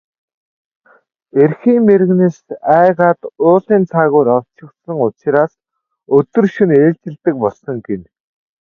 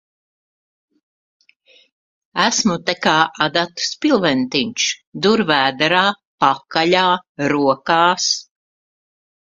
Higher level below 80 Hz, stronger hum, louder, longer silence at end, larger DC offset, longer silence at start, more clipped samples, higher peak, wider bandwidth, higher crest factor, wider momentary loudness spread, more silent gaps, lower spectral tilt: about the same, -58 dBFS vs -60 dBFS; neither; first, -13 LUFS vs -17 LUFS; second, 0.6 s vs 1.15 s; neither; second, 1.35 s vs 2.35 s; neither; about the same, 0 dBFS vs 0 dBFS; second, 6.6 kHz vs 9.6 kHz; second, 14 dB vs 20 dB; first, 11 LU vs 5 LU; second, none vs 5.07-5.12 s, 6.27-6.38 s, 7.29-7.35 s; first, -10 dB/octave vs -3 dB/octave